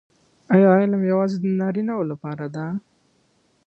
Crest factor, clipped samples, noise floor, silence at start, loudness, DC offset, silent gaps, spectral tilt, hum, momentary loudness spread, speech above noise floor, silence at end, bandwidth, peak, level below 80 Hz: 18 dB; under 0.1%; -63 dBFS; 0.5 s; -21 LUFS; under 0.1%; none; -9.5 dB/octave; none; 15 LU; 44 dB; 0.9 s; 6.2 kHz; -4 dBFS; -66 dBFS